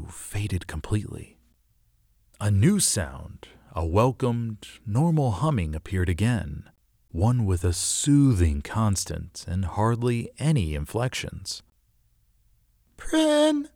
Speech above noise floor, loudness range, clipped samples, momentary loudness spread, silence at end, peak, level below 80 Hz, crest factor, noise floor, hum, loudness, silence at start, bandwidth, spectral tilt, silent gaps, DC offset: 40 dB; 4 LU; under 0.1%; 15 LU; 0.1 s; -8 dBFS; -40 dBFS; 18 dB; -65 dBFS; none; -25 LUFS; 0 s; 17 kHz; -5.5 dB/octave; none; under 0.1%